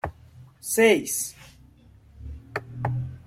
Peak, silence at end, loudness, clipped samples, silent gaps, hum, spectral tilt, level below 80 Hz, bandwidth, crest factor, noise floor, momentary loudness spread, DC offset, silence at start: -6 dBFS; 0.05 s; -24 LUFS; under 0.1%; none; none; -4 dB/octave; -50 dBFS; 16.5 kHz; 22 dB; -53 dBFS; 23 LU; under 0.1%; 0.05 s